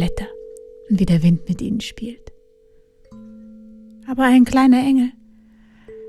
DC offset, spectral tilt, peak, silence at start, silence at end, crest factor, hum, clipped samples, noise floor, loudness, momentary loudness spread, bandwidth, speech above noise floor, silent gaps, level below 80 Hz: under 0.1%; -7 dB/octave; -4 dBFS; 0 s; 0 s; 16 dB; none; under 0.1%; -52 dBFS; -17 LUFS; 21 LU; 12.5 kHz; 37 dB; none; -40 dBFS